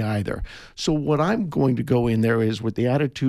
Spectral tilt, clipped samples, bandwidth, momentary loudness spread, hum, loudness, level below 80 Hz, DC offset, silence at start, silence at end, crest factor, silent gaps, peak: -7 dB/octave; under 0.1%; 13.5 kHz; 8 LU; none; -22 LUFS; -42 dBFS; under 0.1%; 0 s; 0 s; 14 dB; none; -8 dBFS